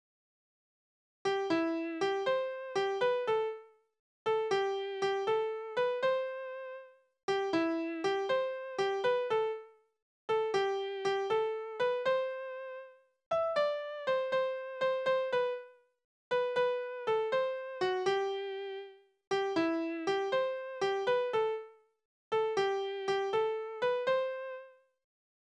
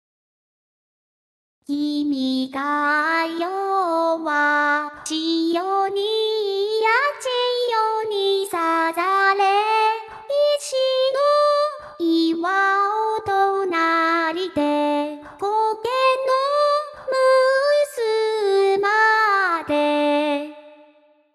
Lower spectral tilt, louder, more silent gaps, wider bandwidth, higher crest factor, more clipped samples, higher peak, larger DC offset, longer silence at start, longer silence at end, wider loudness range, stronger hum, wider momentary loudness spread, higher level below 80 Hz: first, -4 dB/octave vs -2.5 dB/octave; second, -33 LUFS vs -20 LUFS; first, 3.99-4.25 s, 7.23-7.28 s, 10.02-10.28 s, 13.26-13.31 s, 16.04-16.31 s, 19.27-19.31 s, 22.05-22.31 s vs none; second, 9.8 kHz vs 14 kHz; about the same, 14 dB vs 14 dB; neither; second, -18 dBFS vs -6 dBFS; neither; second, 1.25 s vs 1.7 s; first, 0.85 s vs 0.65 s; about the same, 1 LU vs 3 LU; neither; first, 10 LU vs 7 LU; second, -78 dBFS vs -66 dBFS